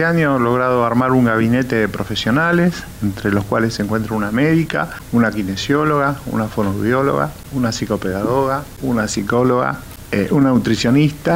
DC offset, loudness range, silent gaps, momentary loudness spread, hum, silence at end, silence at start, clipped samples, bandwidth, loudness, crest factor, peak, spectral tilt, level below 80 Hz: under 0.1%; 2 LU; none; 7 LU; none; 0 s; 0 s; under 0.1%; 16 kHz; -17 LUFS; 12 dB; -4 dBFS; -6 dB/octave; -40 dBFS